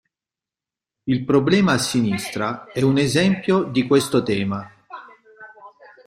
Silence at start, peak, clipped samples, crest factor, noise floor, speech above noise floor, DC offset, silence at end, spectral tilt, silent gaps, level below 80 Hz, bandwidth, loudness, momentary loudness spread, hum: 1.05 s; -4 dBFS; under 0.1%; 18 dB; -89 dBFS; 70 dB; under 0.1%; 0.4 s; -5.5 dB/octave; none; -56 dBFS; 15.5 kHz; -20 LUFS; 15 LU; none